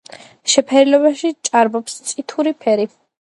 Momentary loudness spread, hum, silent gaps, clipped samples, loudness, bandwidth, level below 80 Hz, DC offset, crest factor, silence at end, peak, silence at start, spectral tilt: 12 LU; none; none; under 0.1%; -16 LUFS; 11.5 kHz; -72 dBFS; under 0.1%; 16 dB; 0.35 s; 0 dBFS; 0.45 s; -2.5 dB/octave